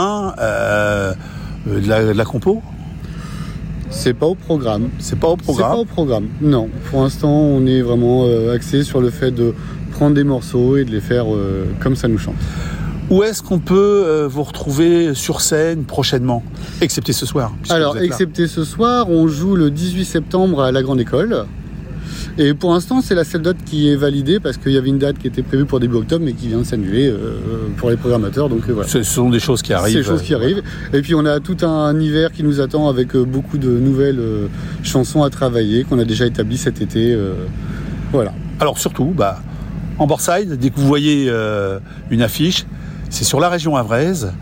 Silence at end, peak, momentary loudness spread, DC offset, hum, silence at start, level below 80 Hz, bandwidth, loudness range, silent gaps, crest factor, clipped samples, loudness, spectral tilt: 0 s; -4 dBFS; 9 LU; under 0.1%; none; 0 s; -32 dBFS; 16.5 kHz; 3 LU; none; 12 dB; under 0.1%; -16 LUFS; -6 dB/octave